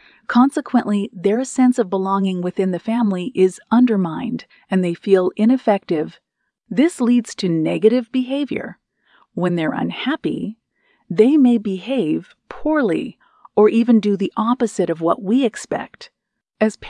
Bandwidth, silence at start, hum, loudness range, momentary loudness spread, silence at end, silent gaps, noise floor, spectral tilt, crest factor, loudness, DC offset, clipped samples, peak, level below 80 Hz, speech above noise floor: 10.5 kHz; 0.3 s; none; 2 LU; 11 LU; 0 s; none; -63 dBFS; -6.5 dB/octave; 16 dB; -18 LUFS; under 0.1%; under 0.1%; -2 dBFS; -58 dBFS; 45 dB